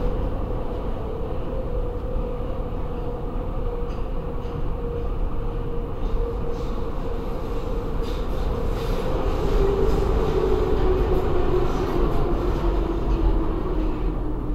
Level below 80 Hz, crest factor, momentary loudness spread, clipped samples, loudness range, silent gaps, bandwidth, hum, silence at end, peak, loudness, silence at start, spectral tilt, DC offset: -24 dBFS; 14 dB; 8 LU; under 0.1%; 7 LU; none; 12 kHz; none; 0 s; -8 dBFS; -27 LUFS; 0 s; -8 dB/octave; 0.3%